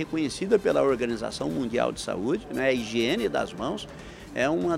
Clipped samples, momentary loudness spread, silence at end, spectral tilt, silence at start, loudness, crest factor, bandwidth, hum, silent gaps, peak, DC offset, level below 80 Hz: under 0.1%; 9 LU; 0 s; -5 dB/octave; 0 s; -27 LUFS; 18 dB; 15.5 kHz; none; none; -8 dBFS; under 0.1%; -52 dBFS